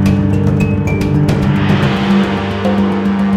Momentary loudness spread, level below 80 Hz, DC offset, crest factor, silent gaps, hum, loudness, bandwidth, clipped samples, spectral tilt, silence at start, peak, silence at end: 2 LU; -28 dBFS; under 0.1%; 12 dB; none; none; -13 LUFS; 12.5 kHz; under 0.1%; -7.5 dB/octave; 0 s; 0 dBFS; 0 s